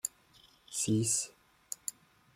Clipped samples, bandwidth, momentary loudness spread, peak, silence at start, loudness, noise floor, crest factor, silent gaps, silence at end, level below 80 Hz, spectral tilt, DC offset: under 0.1%; 16.5 kHz; 14 LU; -16 dBFS; 0.05 s; -34 LUFS; -63 dBFS; 22 dB; none; 0.45 s; -72 dBFS; -4 dB/octave; under 0.1%